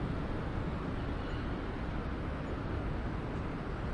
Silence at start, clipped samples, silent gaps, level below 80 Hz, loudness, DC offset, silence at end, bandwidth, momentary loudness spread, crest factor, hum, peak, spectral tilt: 0 s; under 0.1%; none; -42 dBFS; -38 LUFS; under 0.1%; 0 s; 10.5 kHz; 1 LU; 12 dB; none; -24 dBFS; -8 dB/octave